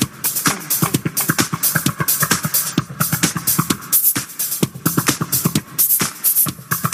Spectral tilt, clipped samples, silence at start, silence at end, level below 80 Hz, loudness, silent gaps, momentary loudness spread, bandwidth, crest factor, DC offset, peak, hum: -3 dB/octave; under 0.1%; 0 s; 0 s; -52 dBFS; -16 LUFS; none; 6 LU; 16 kHz; 18 dB; under 0.1%; 0 dBFS; none